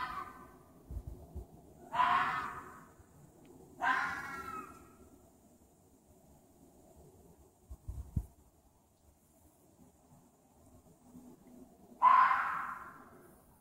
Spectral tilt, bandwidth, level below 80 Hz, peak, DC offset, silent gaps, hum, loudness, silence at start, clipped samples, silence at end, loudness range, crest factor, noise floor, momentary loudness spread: -4.5 dB/octave; 16 kHz; -56 dBFS; -14 dBFS; under 0.1%; none; none; -33 LUFS; 0 s; under 0.1%; 0.5 s; 17 LU; 24 dB; -68 dBFS; 29 LU